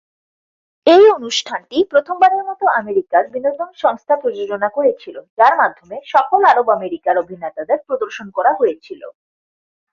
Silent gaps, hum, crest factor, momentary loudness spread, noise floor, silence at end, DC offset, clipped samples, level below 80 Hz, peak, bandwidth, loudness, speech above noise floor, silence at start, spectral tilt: 5.30-5.37 s; none; 16 dB; 11 LU; under -90 dBFS; 0.8 s; under 0.1%; under 0.1%; -66 dBFS; 0 dBFS; 7.8 kHz; -16 LUFS; over 74 dB; 0.85 s; -3.5 dB/octave